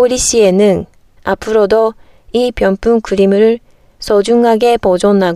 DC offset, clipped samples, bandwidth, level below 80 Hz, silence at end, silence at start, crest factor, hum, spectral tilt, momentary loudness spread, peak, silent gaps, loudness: under 0.1%; under 0.1%; 14 kHz; -36 dBFS; 0 s; 0 s; 10 dB; none; -4.5 dB/octave; 10 LU; 0 dBFS; none; -12 LUFS